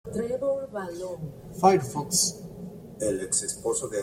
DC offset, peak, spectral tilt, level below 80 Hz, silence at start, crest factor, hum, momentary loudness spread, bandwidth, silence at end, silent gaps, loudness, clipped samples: under 0.1%; -6 dBFS; -3.5 dB/octave; -56 dBFS; 0.05 s; 22 dB; none; 18 LU; 16.5 kHz; 0 s; none; -27 LUFS; under 0.1%